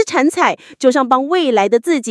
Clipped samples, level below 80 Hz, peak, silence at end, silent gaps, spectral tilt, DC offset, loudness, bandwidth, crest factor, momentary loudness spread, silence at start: under 0.1%; -70 dBFS; 0 dBFS; 0 s; none; -3.5 dB/octave; under 0.1%; -14 LUFS; 12 kHz; 14 dB; 3 LU; 0 s